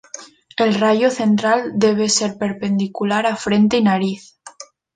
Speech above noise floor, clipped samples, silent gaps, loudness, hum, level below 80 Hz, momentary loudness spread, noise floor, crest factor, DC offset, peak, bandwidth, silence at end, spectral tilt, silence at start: 24 dB; under 0.1%; none; -17 LUFS; none; -58 dBFS; 17 LU; -41 dBFS; 14 dB; under 0.1%; -4 dBFS; 9.4 kHz; 0.3 s; -4.5 dB/octave; 0.15 s